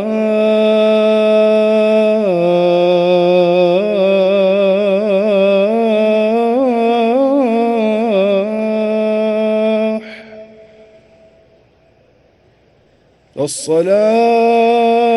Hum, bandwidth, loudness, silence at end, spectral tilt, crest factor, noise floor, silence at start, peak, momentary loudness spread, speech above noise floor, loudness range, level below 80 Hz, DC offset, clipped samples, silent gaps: none; 12 kHz; -13 LUFS; 0 s; -6 dB/octave; 12 dB; -52 dBFS; 0 s; 0 dBFS; 5 LU; 40 dB; 9 LU; -60 dBFS; under 0.1%; under 0.1%; none